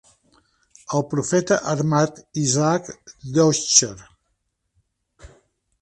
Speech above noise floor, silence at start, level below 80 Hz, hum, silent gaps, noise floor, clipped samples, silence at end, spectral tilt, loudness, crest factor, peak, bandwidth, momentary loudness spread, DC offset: 53 dB; 0.9 s; -56 dBFS; none; none; -73 dBFS; under 0.1%; 0.55 s; -4 dB/octave; -20 LUFS; 22 dB; 0 dBFS; 11.5 kHz; 10 LU; under 0.1%